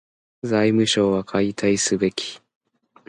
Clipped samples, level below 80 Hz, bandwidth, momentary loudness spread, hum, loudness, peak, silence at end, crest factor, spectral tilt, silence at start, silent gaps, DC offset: under 0.1%; -56 dBFS; 11.5 kHz; 11 LU; none; -20 LUFS; -6 dBFS; 0.7 s; 16 dB; -4 dB/octave; 0.45 s; none; under 0.1%